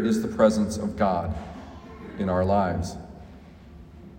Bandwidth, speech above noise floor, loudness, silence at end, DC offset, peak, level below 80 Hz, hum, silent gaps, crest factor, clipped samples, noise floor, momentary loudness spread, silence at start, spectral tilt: 16 kHz; 22 dB; -25 LUFS; 0 s; under 0.1%; -6 dBFS; -46 dBFS; none; none; 20 dB; under 0.1%; -46 dBFS; 22 LU; 0 s; -6.5 dB/octave